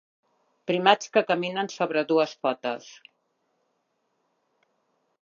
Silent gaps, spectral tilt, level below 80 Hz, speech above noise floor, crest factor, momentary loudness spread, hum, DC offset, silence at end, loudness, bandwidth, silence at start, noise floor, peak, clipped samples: none; -4.5 dB/octave; -84 dBFS; 50 dB; 26 dB; 11 LU; none; under 0.1%; 2.3 s; -25 LUFS; 7.4 kHz; 0.7 s; -75 dBFS; -2 dBFS; under 0.1%